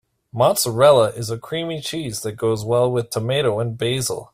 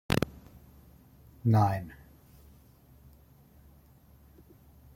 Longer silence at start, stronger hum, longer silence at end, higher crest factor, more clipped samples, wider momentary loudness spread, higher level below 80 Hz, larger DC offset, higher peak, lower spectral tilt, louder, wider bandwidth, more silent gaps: first, 0.35 s vs 0.1 s; neither; second, 0.1 s vs 3.05 s; second, 18 dB vs 26 dB; neither; second, 12 LU vs 29 LU; about the same, -54 dBFS vs -54 dBFS; neither; first, -2 dBFS vs -8 dBFS; second, -4.5 dB/octave vs -7 dB/octave; first, -20 LUFS vs -29 LUFS; about the same, 16 kHz vs 16.5 kHz; neither